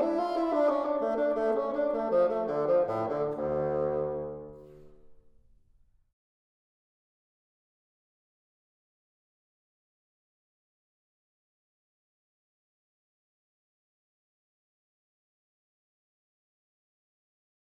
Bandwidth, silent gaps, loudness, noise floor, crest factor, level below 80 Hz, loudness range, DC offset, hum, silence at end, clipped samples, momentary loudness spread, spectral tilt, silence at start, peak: 7 kHz; none; -29 LUFS; -64 dBFS; 20 dB; -64 dBFS; 11 LU; under 0.1%; none; 12.55 s; under 0.1%; 7 LU; -8 dB/octave; 0 s; -16 dBFS